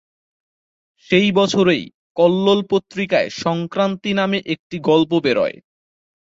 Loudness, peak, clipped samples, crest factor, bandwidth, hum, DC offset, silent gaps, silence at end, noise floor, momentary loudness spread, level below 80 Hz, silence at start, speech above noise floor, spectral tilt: -18 LUFS; -2 dBFS; under 0.1%; 16 dB; 7.8 kHz; none; under 0.1%; 1.94-2.15 s, 4.59-4.70 s; 0.75 s; under -90 dBFS; 7 LU; -58 dBFS; 1.1 s; over 73 dB; -5.5 dB/octave